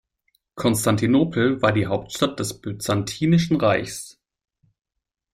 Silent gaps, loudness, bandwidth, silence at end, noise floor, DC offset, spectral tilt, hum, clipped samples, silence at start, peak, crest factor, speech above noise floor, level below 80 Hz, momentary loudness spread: none; -21 LUFS; 16 kHz; 1.2 s; -70 dBFS; under 0.1%; -5.5 dB/octave; none; under 0.1%; 0.55 s; -4 dBFS; 18 dB; 49 dB; -52 dBFS; 10 LU